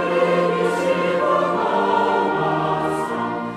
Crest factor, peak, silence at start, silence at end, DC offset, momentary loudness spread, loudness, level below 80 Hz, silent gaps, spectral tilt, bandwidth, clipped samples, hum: 14 dB; -6 dBFS; 0 s; 0 s; under 0.1%; 4 LU; -20 LUFS; -58 dBFS; none; -6 dB/octave; 14 kHz; under 0.1%; none